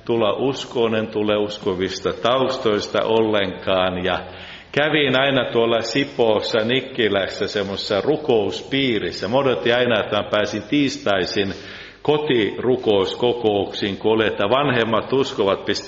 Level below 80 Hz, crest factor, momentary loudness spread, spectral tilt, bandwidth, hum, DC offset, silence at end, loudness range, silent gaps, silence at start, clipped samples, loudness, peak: -54 dBFS; 16 dB; 5 LU; -3 dB/octave; 7.8 kHz; none; under 0.1%; 0 s; 1 LU; none; 0.05 s; under 0.1%; -20 LUFS; -2 dBFS